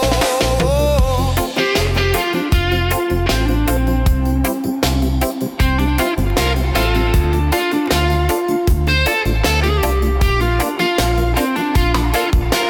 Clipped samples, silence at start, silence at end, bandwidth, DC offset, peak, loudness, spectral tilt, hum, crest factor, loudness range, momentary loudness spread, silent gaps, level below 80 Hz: under 0.1%; 0 s; 0 s; 18 kHz; under 0.1%; -4 dBFS; -16 LUFS; -5 dB/octave; none; 12 dB; 1 LU; 2 LU; none; -20 dBFS